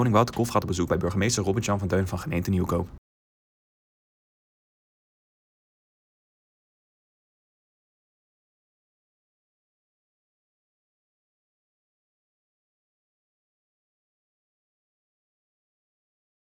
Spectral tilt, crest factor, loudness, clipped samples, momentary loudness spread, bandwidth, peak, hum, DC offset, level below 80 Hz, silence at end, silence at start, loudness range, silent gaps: -5.5 dB/octave; 26 dB; -26 LUFS; under 0.1%; 5 LU; 20 kHz; -6 dBFS; none; under 0.1%; -54 dBFS; 13.6 s; 0 s; 9 LU; none